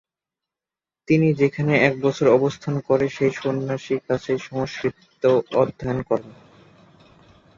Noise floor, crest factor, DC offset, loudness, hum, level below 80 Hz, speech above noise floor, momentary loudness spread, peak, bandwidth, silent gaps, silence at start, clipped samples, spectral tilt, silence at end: -90 dBFS; 20 dB; under 0.1%; -21 LUFS; none; -56 dBFS; 69 dB; 9 LU; -2 dBFS; 7.4 kHz; none; 1.1 s; under 0.1%; -7 dB/octave; 1.25 s